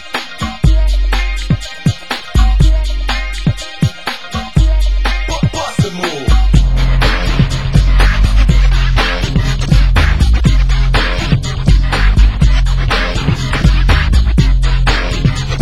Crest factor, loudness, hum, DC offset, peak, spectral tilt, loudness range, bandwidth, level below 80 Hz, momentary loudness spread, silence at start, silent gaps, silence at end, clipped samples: 10 dB; -14 LUFS; none; 3%; 0 dBFS; -5.5 dB/octave; 3 LU; 12 kHz; -12 dBFS; 6 LU; 0 s; none; 0 s; 0.2%